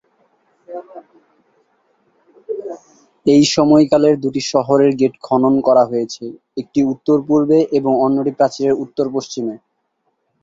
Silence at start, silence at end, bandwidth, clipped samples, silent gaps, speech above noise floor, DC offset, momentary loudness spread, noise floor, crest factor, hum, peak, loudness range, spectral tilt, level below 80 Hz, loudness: 0.7 s; 0.85 s; 7.8 kHz; under 0.1%; none; 53 dB; under 0.1%; 18 LU; -68 dBFS; 16 dB; none; 0 dBFS; 5 LU; -6 dB/octave; -58 dBFS; -15 LUFS